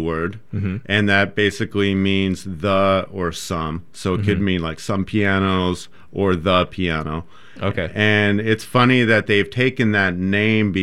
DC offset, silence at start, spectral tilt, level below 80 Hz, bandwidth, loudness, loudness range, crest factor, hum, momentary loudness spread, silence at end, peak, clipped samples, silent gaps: 1%; 0 s; -6 dB/octave; -48 dBFS; 13.5 kHz; -19 LUFS; 4 LU; 18 dB; none; 10 LU; 0 s; -2 dBFS; under 0.1%; none